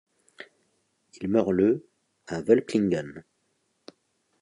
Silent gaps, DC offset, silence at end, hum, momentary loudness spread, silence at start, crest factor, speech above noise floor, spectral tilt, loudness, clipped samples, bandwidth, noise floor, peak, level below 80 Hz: none; under 0.1%; 1.2 s; none; 25 LU; 0.4 s; 22 dB; 49 dB; -7.5 dB/octave; -25 LUFS; under 0.1%; 11 kHz; -73 dBFS; -6 dBFS; -60 dBFS